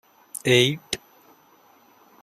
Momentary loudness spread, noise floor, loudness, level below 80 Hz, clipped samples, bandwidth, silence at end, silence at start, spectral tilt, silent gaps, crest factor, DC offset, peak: 15 LU; -56 dBFS; -22 LUFS; -62 dBFS; under 0.1%; 15.5 kHz; 1.25 s; 0.45 s; -4 dB/octave; none; 22 dB; under 0.1%; -4 dBFS